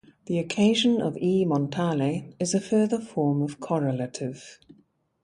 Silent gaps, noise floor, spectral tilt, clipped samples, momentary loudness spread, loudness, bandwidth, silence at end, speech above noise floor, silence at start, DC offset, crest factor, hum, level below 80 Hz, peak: none; -63 dBFS; -5.5 dB/octave; under 0.1%; 8 LU; -25 LUFS; 11.5 kHz; 0.7 s; 38 dB; 0.3 s; under 0.1%; 16 dB; none; -66 dBFS; -10 dBFS